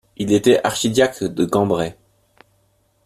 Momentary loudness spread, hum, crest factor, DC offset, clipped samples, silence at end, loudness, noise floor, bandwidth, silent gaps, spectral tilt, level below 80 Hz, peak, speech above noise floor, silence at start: 7 LU; none; 18 dB; under 0.1%; under 0.1%; 1.15 s; -18 LUFS; -62 dBFS; 15 kHz; none; -5 dB/octave; -52 dBFS; -2 dBFS; 45 dB; 0.2 s